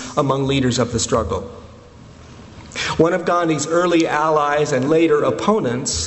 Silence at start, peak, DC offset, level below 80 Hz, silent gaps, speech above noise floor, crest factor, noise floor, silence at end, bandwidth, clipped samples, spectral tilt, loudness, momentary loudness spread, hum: 0 s; 0 dBFS; under 0.1%; -42 dBFS; none; 24 dB; 18 dB; -41 dBFS; 0 s; 8.4 kHz; under 0.1%; -4.5 dB/octave; -18 LUFS; 7 LU; none